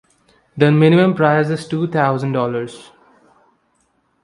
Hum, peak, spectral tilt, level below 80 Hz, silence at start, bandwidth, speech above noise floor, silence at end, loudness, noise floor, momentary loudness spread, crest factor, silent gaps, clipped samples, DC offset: none; 0 dBFS; -8 dB/octave; -60 dBFS; 0.55 s; 11 kHz; 48 dB; 1.4 s; -16 LUFS; -63 dBFS; 13 LU; 18 dB; none; under 0.1%; under 0.1%